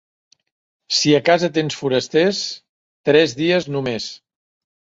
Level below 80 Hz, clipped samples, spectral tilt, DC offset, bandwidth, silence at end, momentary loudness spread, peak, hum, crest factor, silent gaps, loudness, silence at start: -60 dBFS; under 0.1%; -4 dB/octave; under 0.1%; 8 kHz; 0.8 s; 12 LU; -2 dBFS; none; 18 dB; 2.69-3.04 s; -18 LUFS; 0.9 s